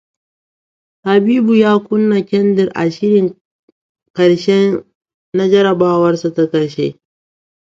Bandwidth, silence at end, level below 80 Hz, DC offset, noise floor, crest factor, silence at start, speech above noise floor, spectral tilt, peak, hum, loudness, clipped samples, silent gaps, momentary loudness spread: 7.6 kHz; 0.8 s; -58 dBFS; under 0.1%; under -90 dBFS; 14 dB; 1.05 s; over 78 dB; -7 dB/octave; 0 dBFS; none; -14 LUFS; under 0.1%; 3.41-3.95 s, 4.10-4.14 s, 4.95-5.01 s, 5.14-5.32 s; 10 LU